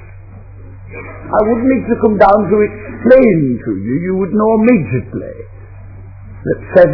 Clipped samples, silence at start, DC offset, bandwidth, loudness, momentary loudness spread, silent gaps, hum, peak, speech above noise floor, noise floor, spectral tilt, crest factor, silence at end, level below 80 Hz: 0.5%; 0 s; under 0.1%; 5.4 kHz; -12 LUFS; 21 LU; none; none; 0 dBFS; 21 dB; -33 dBFS; -11 dB/octave; 14 dB; 0 s; -36 dBFS